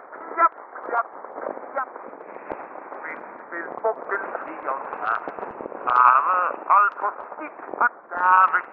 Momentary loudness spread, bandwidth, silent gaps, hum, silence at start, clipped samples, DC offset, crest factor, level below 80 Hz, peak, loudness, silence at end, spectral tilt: 19 LU; 4.7 kHz; none; none; 0 s; under 0.1%; under 0.1%; 22 dB; -72 dBFS; -2 dBFS; -22 LUFS; 0 s; -6.5 dB/octave